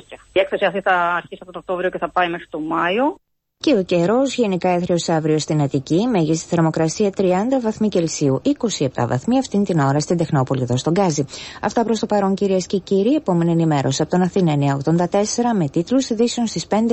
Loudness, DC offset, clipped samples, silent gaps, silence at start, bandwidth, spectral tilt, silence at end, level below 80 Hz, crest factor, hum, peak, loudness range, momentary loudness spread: -19 LUFS; under 0.1%; under 0.1%; none; 0.1 s; 8.6 kHz; -5.5 dB/octave; 0 s; -52 dBFS; 14 dB; none; -4 dBFS; 2 LU; 5 LU